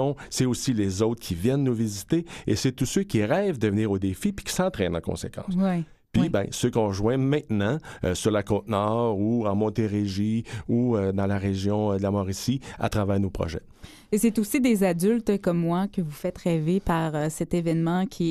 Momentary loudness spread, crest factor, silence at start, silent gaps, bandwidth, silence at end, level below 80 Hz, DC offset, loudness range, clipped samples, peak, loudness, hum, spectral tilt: 6 LU; 16 dB; 0 s; none; 14.5 kHz; 0 s; -48 dBFS; under 0.1%; 2 LU; under 0.1%; -10 dBFS; -26 LUFS; none; -6 dB/octave